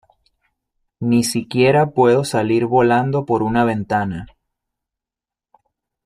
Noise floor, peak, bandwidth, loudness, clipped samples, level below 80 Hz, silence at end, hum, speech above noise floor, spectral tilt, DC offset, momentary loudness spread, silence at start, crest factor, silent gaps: -88 dBFS; -2 dBFS; 15.5 kHz; -17 LUFS; under 0.1%; -52 dBFS; 1.8 s; none; 72 dB; -6 dB/octave; under 0.1%; 7 LU; 1 s; 16 dB; none